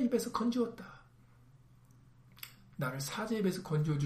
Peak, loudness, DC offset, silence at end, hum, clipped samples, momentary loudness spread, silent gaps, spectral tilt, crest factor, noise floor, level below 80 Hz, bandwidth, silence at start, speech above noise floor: -20 dBFS; -35 LUFS; under 0.1%; 0 s; none; under 0.1%; 17 LU; none; -6 dB/octave; 18 dB; -61 dBFS; -66 dBFS; 15.5 kHz; 0 s; 27 dB